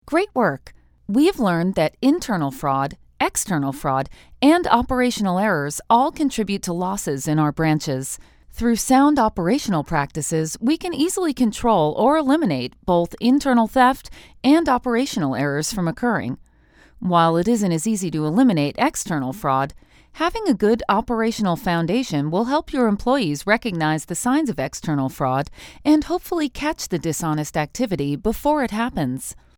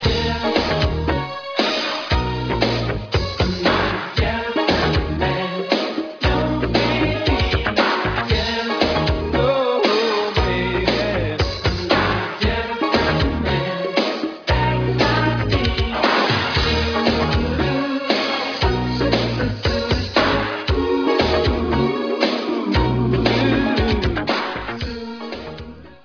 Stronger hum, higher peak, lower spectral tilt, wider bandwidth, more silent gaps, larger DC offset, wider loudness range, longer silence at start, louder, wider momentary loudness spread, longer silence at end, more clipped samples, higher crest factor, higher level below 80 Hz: neither; about the same, 0 dBFS vs 0 dBFS; about the same, -5 dB/octave vs -6 dB/octave; first, over 20 kHz vs 5.4 kHz; neither; neither; about the same, 3 LU vs 2 LU; about the same, 0.05 s vs 0 s; about the same, -20 LUFS vs -19 LUFS; first, 8 LU vs 5 LU; first, 0.25 s vs 0.1 s; neither; about the same, 20 dB vs 20 dB; second, -44 dBFS vs -30 dBFS